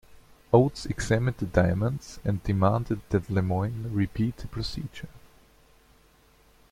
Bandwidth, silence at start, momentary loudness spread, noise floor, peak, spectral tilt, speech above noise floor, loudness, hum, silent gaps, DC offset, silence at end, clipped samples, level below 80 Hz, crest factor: 15 kHz; 0.5 s; 11 LU; -59 dBFS; -6 dBFS; -7 dB/octave; 33 dB; -27 LUFS; none; none; under 0.1%; 1.55 s; under 0.1%; -46 dBFS; 22 dB